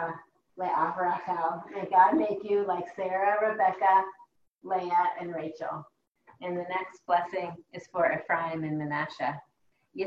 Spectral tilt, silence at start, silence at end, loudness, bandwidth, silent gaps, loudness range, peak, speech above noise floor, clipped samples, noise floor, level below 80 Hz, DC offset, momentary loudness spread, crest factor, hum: -7 dB/octave; 0 s; 0 s; -29 LUFS; 7.4 kHz; 4.50-4.54 s, 6.08-6.12 s; 6 LU; -10 dBFS; 24 dB; under 0.1%; -53 dBFS; -74 dBFS; under 0.1%; 14 LU; 20 dB; none